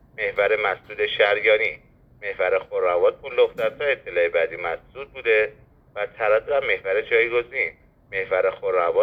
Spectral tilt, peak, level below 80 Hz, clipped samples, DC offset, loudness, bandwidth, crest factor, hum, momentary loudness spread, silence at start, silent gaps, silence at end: -5.5 dB/octave; -6 dBFS; -56 dBFS; under 0.1%; under 0.1%; -22 LUFS; 5.2 kHz; 18 dB; none; 11 LU; 0.2 s; none; 0 s